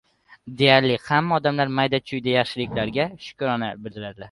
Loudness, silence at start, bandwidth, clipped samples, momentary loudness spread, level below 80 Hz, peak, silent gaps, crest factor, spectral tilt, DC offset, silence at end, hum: -22 LUFS; 0.45 s; 11.5 kHz; under 0.1%; 15 LU; -56 dBFS; -2 dBFS; none; 22 dB; -6.5 dB/octave; under 0.1%; 0.05 s; none